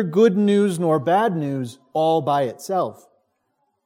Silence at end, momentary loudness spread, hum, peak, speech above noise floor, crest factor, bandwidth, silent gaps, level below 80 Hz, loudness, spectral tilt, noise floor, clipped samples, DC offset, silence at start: 0.95 s; 10 LU; none; -6 dBFS; 51 dB; 16 dB; 16 kHz; none; -72 dBFS; -20 LUFS; -7 dB/octave; -71 dBFS; under 0.1%; under 0.1%; 0 s